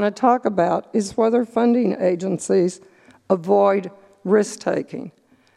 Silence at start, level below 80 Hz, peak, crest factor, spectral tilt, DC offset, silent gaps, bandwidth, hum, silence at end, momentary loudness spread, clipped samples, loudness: 0 s; -64 dBFS; -2 dBFS; 18 dB; -6 dB/octave; under 0.1%; none; 12 kHz; none; 0.5 s; 16 LU; under 0.1%; -20 LUFS